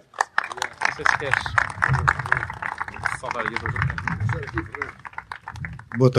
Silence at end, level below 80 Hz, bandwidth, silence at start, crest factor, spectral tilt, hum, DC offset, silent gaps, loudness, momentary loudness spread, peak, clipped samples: 0 s; -44 dBFS; 12.5 kHz; 0.2 s; 24 dB; -5.5 dB/octave; none; under 0.1%; none; -24 LUFS; 13 LU; -2 dBFS; under 0.1%